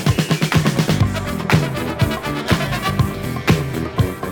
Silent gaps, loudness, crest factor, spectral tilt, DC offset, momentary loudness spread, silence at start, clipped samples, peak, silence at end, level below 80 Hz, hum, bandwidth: none; -19 LUFS; 16 dB; -5.5 dB/octave; under 0.1%; 5 LU; 0 s; under 0.1%; -2 dBFS; 0 s; -36 dBFS; none; over 20 kHz